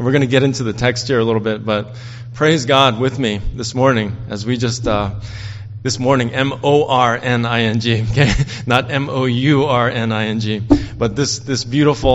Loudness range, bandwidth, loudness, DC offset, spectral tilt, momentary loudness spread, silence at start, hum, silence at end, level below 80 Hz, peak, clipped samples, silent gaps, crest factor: 3 LU; 8.2 kHz; -16 LUFS; under 0.1%; -5.5 dB/octave; 9 LU; 0 s; none; 0 s; -34 dBFS; 0 dBFS; under 0.1%; none; 16 dB